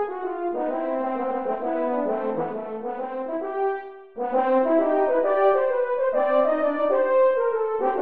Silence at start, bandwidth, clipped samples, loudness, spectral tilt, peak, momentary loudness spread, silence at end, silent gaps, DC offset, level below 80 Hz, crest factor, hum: 0 s; 4.3 kHz; under 0.1%; -23 LUFS; -4 dB/octave; -10 dBFS; 10 LU; 0 s; none; 0.5%; -66 dBFS; 14 dB; none